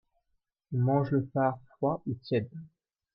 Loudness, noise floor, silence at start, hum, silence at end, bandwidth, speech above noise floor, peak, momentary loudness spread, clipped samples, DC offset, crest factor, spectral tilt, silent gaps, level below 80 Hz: -30 LUFS; -79 dBFS; 0.7 s; none; 0.5 s; 5.6 kHz; 50 dB; -14 dBFS; 9 LU; under 0.1%; under 0.1%; 18 dB; -11.5 dB/octave; none; -68 dBFS